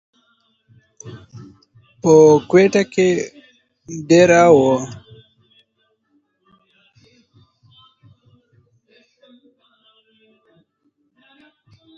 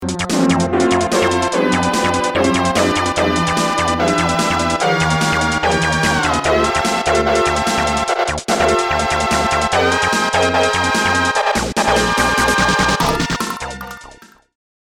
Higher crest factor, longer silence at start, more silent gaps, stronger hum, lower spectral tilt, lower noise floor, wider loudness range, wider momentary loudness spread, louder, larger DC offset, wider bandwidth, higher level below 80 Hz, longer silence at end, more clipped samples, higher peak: first, 20 dB vs 14 dB; first, 1.05 s vs 0 s; neither; neither; first, -6 dB/octave vs -4 dB/octave; first, -67 dBFS vs -42 dBFS; first, 5 LU vs 1 LU; first, 27 LU vs 3 LU; about the same, -13 LUFS vs -15 LUFS; second, under 0.1% vs 0.2%; second, 7.8 kHz vs 19 kHz; second, -58 dBFS vs -34 dBFS; first, 7.05 s vs 0.8 s; neither; about the same, 0 dBFS vs -2 dBFS